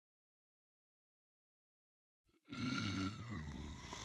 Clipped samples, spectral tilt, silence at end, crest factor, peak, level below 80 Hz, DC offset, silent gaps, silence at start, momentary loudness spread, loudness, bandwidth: under 0.1%; -4.5 dB/octave; 0 s; 20 dB; -28 dBFS; -64 dBFS; under 0.1%; none; 2.5 s; 10 LU; -45 LUFS; 12 kHz